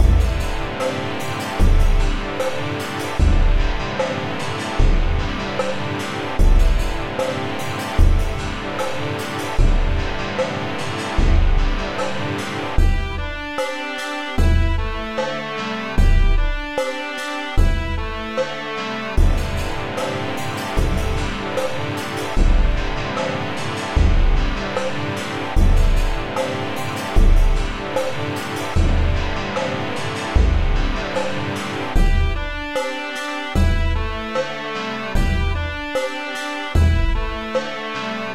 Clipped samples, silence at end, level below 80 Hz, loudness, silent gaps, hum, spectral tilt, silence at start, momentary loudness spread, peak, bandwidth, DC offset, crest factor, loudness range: under 0.1%; 0 s; -20 dBFS; -22 LUFS; none; none; -5.5 dB/octave; 0 s; 6 LU; -2 dBFS; 12.5 kHz; 1%; 16 dB; 1 LU